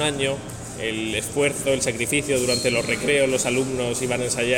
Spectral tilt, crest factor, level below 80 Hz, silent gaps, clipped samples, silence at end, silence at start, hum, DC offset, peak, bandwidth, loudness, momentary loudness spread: -3 dB/octave; 16 dB; -48 dBFS; none; under 0.1%; 0 s; 0 s; none; under 0.1%; -6 dBFS; 18 kHz; -22 LUFS; 7 LU